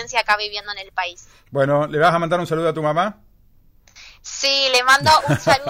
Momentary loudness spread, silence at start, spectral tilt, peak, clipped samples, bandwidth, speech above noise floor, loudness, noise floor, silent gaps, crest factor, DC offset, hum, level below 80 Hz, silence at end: 14 LU; 0 s; -3.5 dB/octave; -4 dBFS; under 0.1%; 16 kHz; 33 dB; -18 LUFS; -52 dBFS; none; 14 dB; under 0.1%; none; -50 dBFS; 0 s